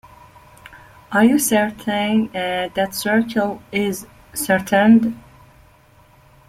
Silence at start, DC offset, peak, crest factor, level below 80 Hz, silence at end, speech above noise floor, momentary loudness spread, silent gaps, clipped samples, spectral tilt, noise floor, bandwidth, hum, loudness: 0.7 s; under 0.1%; -2 dBFS; 18 dB; -54 dBFS; 1.3 s; 33 dB; 11 LU; none; under 0.1%; -4.5 dB/octave; -51 dBFS; 16 kHz; none; -18 LUFS